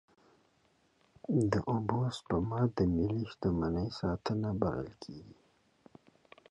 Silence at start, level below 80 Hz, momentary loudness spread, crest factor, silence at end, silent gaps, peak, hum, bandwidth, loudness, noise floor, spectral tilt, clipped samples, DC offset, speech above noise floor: 1.3 s; -52 dBFS; 14 LU; 20 dB; 1.2 s; none; -16 dBFS; none; 11 kHz; -33 LUFS; -71 dBFS; -8 dB/octave; under 0.1%; under 0.1%; 38 dB